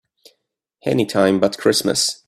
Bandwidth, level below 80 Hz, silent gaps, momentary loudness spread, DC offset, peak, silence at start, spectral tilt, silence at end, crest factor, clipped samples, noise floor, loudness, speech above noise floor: 15.5 kHz; -58 dBFS; none; 5 LU; under 0.1%; -2 dBFS; 0.85 s; -3.5 dB/octave; 0.15 s; 18 dB; under 0.1%; -73 dBFS; -18 LUFS; 55 dB